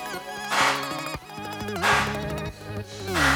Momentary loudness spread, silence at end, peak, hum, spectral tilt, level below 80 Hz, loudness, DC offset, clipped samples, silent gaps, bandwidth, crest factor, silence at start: 13 LU; 0 s; -8 dBFS; none; -3 dB/octave; -44 dBFS; -26 LUFS; under 0.1%; under 0.1%; none; over 20 kHz; 18 dB; 0 s